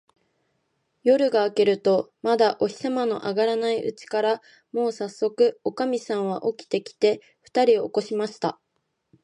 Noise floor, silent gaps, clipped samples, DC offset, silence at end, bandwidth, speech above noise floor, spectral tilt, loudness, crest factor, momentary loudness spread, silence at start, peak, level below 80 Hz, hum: -75 dBFS; none; under 0.1%; under 0.1%; 0.7 s; 10.5 kHz; 52 dB; -5 dB/octave; -24 LUFS; 18 dB; 8 LU; 1.05 s; -6 dBFS; -76 dBFS; none